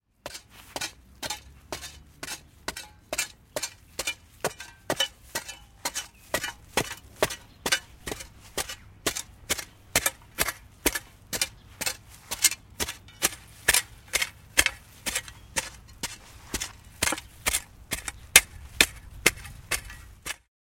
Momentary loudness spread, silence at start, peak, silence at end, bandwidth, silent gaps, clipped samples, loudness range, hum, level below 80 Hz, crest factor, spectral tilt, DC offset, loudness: 15 LU; 0.25 s; 0 dBFS; 0.4 s; 17 kHz; none; under 0.1%; 10 LU; none; -50 dBFS; 32 dB; -0.5 dB/octave; under 0.1%; -28 LUFS